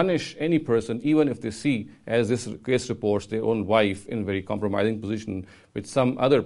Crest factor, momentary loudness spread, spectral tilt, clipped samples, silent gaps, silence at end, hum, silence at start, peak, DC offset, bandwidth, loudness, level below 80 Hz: 18 dB; 8 LU; -6 dB/octave; under 0.1%; none; 0 s; none; 0 s; -6 dBFS; under 0.1%; 11.5 kHz; -25 LUFS; -58 dBFS